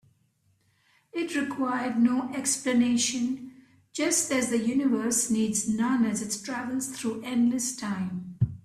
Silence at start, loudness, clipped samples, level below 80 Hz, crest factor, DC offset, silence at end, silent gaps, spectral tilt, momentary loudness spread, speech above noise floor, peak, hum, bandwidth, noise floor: 1.15 s; -27 LUFS; under 0.1%; -60 dBFS; 16 dB; under 0.1%; 0.05 s; none; -4 dB/octave; 8 LU; 42 dB; -12 dBFS; none; 14.5 kHz; -69 dBFS